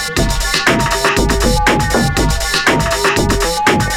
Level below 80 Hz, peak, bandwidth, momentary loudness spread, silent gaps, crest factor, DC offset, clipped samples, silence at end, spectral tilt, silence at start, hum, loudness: -22 dBFS; 0 dBFS; 18.5 kHz; 2 LU; none; 14 dB; under 0.1%; under 0.1%; 0 s; -3.5 dB/octave; 0 s; none; -13 LUFS